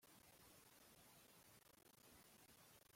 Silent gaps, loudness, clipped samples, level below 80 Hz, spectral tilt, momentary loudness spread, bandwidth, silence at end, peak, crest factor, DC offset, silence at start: none; -68 LUFS; under 0.1%; -88 dBFS; -2.5 dB/octave; 2 LU; 16.5 kHz; 0 s; -54 dBFS; 14 dB; under 0.1%; 0 s